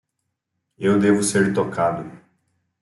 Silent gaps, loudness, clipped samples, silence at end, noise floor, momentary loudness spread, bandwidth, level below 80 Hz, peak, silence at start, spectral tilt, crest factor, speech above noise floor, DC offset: none; -20 LUFS; under 0.1%; 0.65 s; -78 dBFS; 11 LU; 12 kHz; -62 dBFS; -4 dBFS; 0.8 s; -5.5 dB/octave; 18 dB; 59 dB; under 0.1%